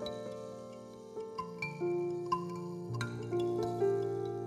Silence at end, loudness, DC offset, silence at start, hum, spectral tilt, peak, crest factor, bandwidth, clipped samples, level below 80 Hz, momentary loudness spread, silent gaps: 0 s; -37 LUFS; under 0.1%; 0 s; none; -7 dB/octave; -20 dBFS; 18 dB; 13 kHz; under 0.1%; -70 dBFS; 14 LU; none